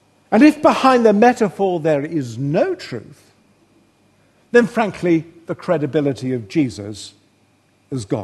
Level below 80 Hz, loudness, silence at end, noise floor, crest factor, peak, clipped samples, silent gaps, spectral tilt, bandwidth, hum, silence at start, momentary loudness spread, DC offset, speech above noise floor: -60 dBFS; -17 LUFS; 0 s; -58 dBFS; 18 dB; 0 dBFS; under 0.1%; none; -6.5 dB/octave; 12.5 kHz; none; 0.3 s; 18 LU; under 0.1%; 41 dB